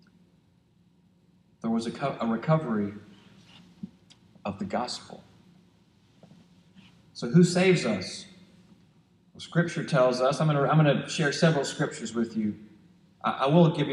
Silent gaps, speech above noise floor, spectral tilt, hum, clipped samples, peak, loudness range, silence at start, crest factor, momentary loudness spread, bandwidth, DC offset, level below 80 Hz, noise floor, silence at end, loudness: none; 38 dB; -6 dB/octave; none; under 0.1%; -8 dBFS; 13 LU; 1.65 s; 20 dB; 21 LU; 11 kHz; under 0.1%; -68 dBFS; -63 dBFS; 0 s; -26 LUFS